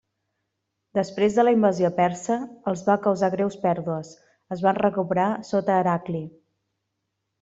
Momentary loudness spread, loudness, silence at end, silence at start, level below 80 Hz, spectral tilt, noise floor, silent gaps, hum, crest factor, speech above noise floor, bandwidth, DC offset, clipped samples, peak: 11 LU; -23 LUFS; 1.1 s; 0.95 s; -66 dBFS; -7 dB/octave; -79 dBFS; none; none; 18 dB; 56 dB; 8 kHz; under 0.1%; under 0.1%; -6 dBFS